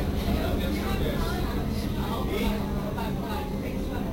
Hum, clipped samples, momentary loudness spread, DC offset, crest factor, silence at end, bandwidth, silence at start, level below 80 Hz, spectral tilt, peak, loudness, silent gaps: none; under 0.1%; 4 LU; under 0.1%; 14 dB; 0 s; 16 kHz; 0 s; -32 dBFS; -6.5 dB/octave; -14 dBFS; -29 LUFS; none